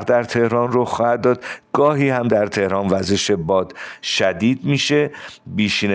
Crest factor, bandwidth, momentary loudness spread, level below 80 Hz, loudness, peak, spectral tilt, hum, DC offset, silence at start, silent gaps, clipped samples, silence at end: 14 dB; 10 kHz; 7 LU; -54 dBFS; -18 LUFS; -4 dBFS; -5 dB/octave; none; under 0.1%; 0 s; none; under 0.1%; 0 s